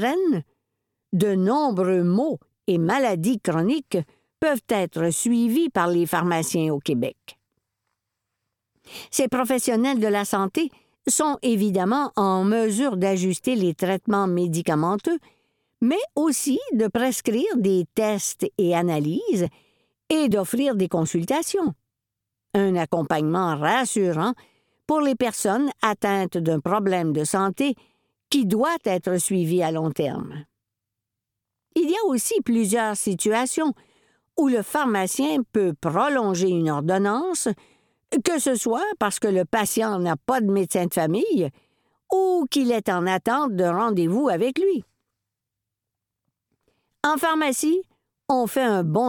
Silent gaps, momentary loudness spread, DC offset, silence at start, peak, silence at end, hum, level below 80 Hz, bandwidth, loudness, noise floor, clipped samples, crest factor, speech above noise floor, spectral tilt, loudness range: none; 5 LU; under 0.1%; 0 s; -4 dBFS; 0 s; none; -64 dBFS; 19 kHz; -23 LUFS; -85 dBFS; under 0.1%; 18 dB; 63 dB; -5 dB/octave; 3 LU